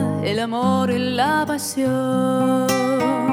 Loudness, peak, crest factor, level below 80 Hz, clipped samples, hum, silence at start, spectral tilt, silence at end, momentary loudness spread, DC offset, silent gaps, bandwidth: -20 LUFS; -6 dBFS; 14 dB; -60 dBFS; under 0.1%; none; 0 s; -5 dB/octave; 0 s; 3 LU; under 0.1%; none; 19.5 kHz